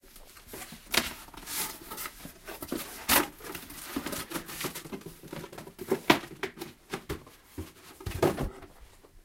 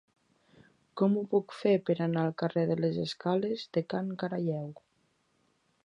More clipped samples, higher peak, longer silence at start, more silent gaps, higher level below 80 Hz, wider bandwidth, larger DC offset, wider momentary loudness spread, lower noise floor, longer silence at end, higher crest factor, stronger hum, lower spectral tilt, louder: neither; first, -2 dBFS vs -12 dBFS; second, 0.05 s vs 0.95 s; neither; first, -52 dBFS vs -74 dBFS; first, 17 kHz vs 10 kHz; neither; first, 19 LU vs 6 LU; second, -54 dBFS vs -73 dBFS; second, 0.05 s vs 1.1 s; first, 34 dB vs 20 dB; neither; second, -3 dB/octave vs -8 dB/octave; about the same, -32 LUFS vs -31 LUFS